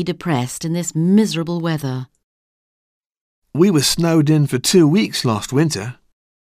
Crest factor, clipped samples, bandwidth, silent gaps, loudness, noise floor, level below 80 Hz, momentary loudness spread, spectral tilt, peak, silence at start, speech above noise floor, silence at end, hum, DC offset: 16 dB; under 0.1%; 16 kHz; 2.24-3.10 s, 3.21-3.42 s; -17 LUFS; under -90 dBFS; -50 dBFS; 11 LU; -5 dB/octave; -2 dBFS; 0 s; over 74 dB; 0.65 s; none; under 0.1%